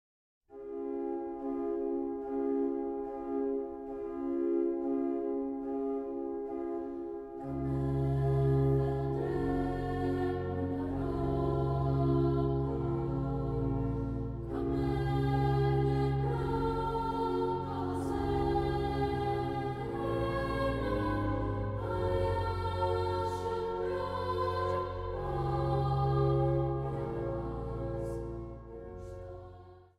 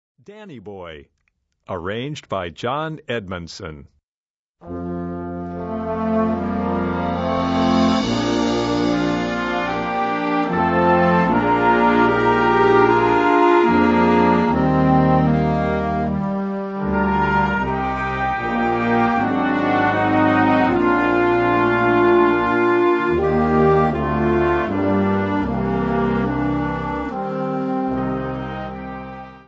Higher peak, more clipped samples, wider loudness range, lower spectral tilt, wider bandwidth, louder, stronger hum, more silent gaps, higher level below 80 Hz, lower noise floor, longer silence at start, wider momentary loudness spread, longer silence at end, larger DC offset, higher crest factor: second, -18 dBFS vs -2 dBFS; neither; second, 4 LU vs 13 LU; first, -9 dB/octave vs -7.5 dB/octave; first, 10.5 kHz vs 7.8 kHz; second, -33 LUFS vs -18 LUFS; neither; second, none vs 4.03-4.55 s; second, -44 dBFS vs -38 dBFS; second, -53 dBFS vs under -90 dBFS; first, 0.5 s vs 0.3 s; second, 9 LU vs 13 LU; about the same, 0.15 s vs 0.1 s; neither; about the same, 14 dB vs 16 dB